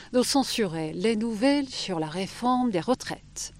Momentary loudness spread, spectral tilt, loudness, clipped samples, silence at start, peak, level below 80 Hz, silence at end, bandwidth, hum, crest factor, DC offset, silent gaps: 6 LU; -4 dB/octave; -27 LUFS; under 0.1%; 0 s; -10 dBFS; -56 dBFS; 0 s; 16 kHz; none; 16 dB; under 0.1%; none